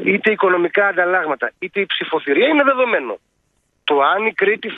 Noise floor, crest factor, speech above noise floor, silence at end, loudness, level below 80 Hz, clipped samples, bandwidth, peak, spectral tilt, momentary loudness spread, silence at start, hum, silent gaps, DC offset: -66 dBFS; 18 dB; 49 dB; 0 s; -17 LUFS; -68 dBFS; under 0.1%; 4.7 kHz; 0 dBFS; -7 dB/octave; 8 LU; 0 s; none; none; under 0.1%